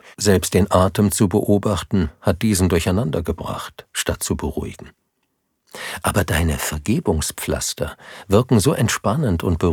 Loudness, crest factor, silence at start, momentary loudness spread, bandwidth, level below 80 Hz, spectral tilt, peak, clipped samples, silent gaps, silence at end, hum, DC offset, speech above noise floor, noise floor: -20 LUFS; 18 dB; 0.05 s; 12 LU; 19.5 kHz; -38 dBFS; -5 dB/octave; -2 dBFS; under 0.1%; none; 0 s; none; under 0.1%; 52 dB; -71 dBFS